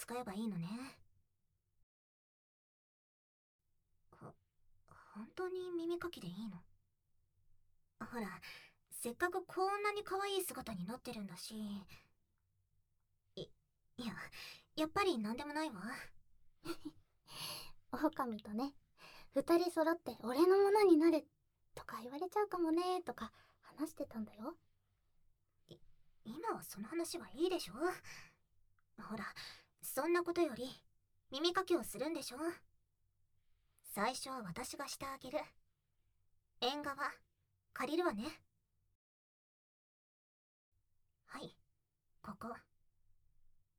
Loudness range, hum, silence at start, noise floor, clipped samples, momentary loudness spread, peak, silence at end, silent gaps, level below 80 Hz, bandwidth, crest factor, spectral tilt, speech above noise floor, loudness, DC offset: 17 LU; none; 0 s; -82 dBFS; under 0.1%; 20 LU; -20 dBFS; 1.2 s; 1.83-3.59 s, 38.95-40.72 s; -72 dBFS; 19.5 kHz; 22 dB; -4.5 dB/octave; 43 dB; -40 LUFS; under 0.1%